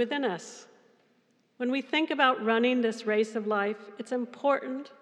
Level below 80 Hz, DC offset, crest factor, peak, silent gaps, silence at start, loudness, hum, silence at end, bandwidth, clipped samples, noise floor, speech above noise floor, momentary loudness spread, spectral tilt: under -90 dBFS; under 0.1%; 20 dB; -8 dBFS; none; 0 s; -28 LUFS; none; 0.1 s; 10.5 kHz; under 0.1%; -68 dBFS; 40 dB; 13 LU; -4.5 dB/octave